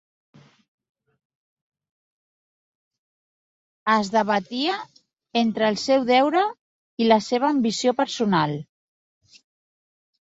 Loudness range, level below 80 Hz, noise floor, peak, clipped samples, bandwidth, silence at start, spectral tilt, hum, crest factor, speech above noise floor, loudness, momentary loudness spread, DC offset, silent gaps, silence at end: 6 LU; -68 dBFS; under -90 dBFS; -2 dBFS; under 0.1%; 8 kHz; 3.85 s; -5 dB/octave; none; 22 dB; over 69 dB; -22 LUFS; 9 LU; under 0.1%; 6.61-6.97 s; 1.65 s